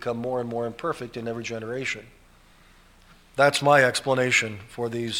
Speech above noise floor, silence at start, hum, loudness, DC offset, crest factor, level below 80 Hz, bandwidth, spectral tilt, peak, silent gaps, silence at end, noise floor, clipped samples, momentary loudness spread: 30 dB; 0 s; none; -24 LUFS; under 0.1%; 22 dB; -58 dBFS; 16.5 kHz; -4 dB/octave; -4 dBFS; none; 0 s; -54 dBFS; under 0.1%; 14 LU